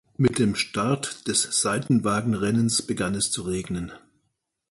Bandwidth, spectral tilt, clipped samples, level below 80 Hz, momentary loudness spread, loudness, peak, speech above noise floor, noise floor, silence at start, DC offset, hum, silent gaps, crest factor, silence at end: 11.5 kHz; -4 dB/octave; under 0.1%; -52 dBFS; 7 LU; -24 LUFS; -8 dBFS; 52 dB; -76 dBFS; 0.2 s; under 0.1%; none; none; 18 dB; 0.75 s